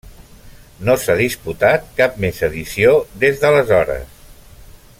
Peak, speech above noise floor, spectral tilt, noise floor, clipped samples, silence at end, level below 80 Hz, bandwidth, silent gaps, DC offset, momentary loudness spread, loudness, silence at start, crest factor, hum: -2 dBFS; 25 dB; -5 dB/octave; -41 dBFS; under 0.1%; 0.35 s; -40 dBFS; 16.5 kHz; none; under 0.1%; 8 LU; -16 LUFS; 0.05 s; 16 dB; none